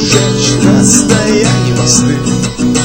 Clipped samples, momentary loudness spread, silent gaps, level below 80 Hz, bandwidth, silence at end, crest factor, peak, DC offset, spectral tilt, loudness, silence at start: 0.8%; 6 LU; none; -30 dBFS; over 20 kHz; 0 s; 10 dB; 0 dBFS; under 0.1%; -4 dB/octave; -9 LUFS; 0 s